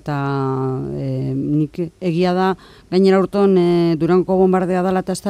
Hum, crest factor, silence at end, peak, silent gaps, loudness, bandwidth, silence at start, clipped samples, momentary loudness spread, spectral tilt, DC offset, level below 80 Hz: none; 14 dB; 0 s; -2 dBFS; none; -17 LUFS; 11 kHz; 0.05 s; under 0.1%; 9 LU; -7.5 dB/octave; under 0.1%; -48 dBFS